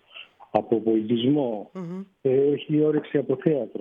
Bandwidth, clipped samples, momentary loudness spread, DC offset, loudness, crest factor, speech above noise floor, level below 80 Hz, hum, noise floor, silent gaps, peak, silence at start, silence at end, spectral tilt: 4.3 kHz; under 0.1%; 13 LU; under 0.1%; -24 LUFS; 18 dB; 24 dB; -70 dBFS; none; -47 dBFS; none; -6 dBFS; 0.15 s; 0 s; -9.5 dB/octave